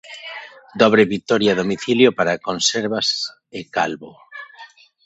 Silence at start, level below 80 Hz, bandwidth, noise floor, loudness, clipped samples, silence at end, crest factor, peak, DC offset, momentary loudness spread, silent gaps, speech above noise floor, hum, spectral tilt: 0.05 s; -60 dBFS; 8.2 kHz; -45 dBFS; -18 LUFS; under 0.1%; 0.4 s; 20 dB; 0 dBFS; under 0.1%; 21 LU; none; 26 dB; none; -3.5 dB/octave